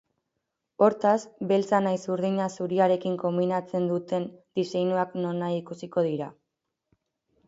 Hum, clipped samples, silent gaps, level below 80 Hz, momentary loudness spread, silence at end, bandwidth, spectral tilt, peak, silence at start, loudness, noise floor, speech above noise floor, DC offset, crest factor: none; under 0.1%; none; -74 dBFS; 8 LU; 1.15 s; 8 kHz; -7 dB/octave; -6 dBFS; 0.8 s; -27 LUFS; -83 dBFS; 57 dB; under 0.1%; 20 dB